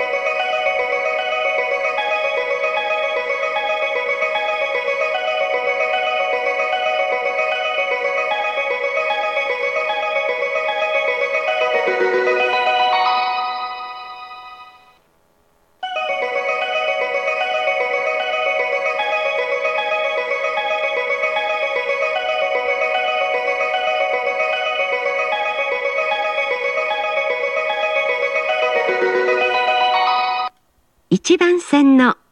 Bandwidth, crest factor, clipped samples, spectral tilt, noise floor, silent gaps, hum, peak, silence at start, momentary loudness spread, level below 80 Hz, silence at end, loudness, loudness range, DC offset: 10.5 kHz; 18 dB; under 0.1%; -3.5 dB/octave; -61 dBFS; none; none; -2 dBFS; 0 s; 4 LU; -68 dBFS; 0.2 s; -18 LUFS; 3 LU; under 0.1%